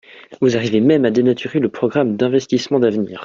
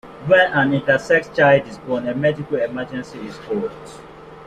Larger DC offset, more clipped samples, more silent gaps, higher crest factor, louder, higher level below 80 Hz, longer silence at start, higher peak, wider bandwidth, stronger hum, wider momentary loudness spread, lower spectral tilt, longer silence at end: neither; neither; neither; about the same, 14 dB vs 18 dB; about the same, -17 LUFS vs -18 LUFS; about the same, -58 dBFS vs -54 dBFS; about the same, 0.15 s vs 0.05 s; about the same, -2 dBFS vs -2 dBFS; second, 7.6 kHz vs 9.6 kHz; neither; second, 5 LU vs 16 LU; about the same, -6.5 dB/octave vs -6.5 dB/octave; about the same, 0 s vs 0 s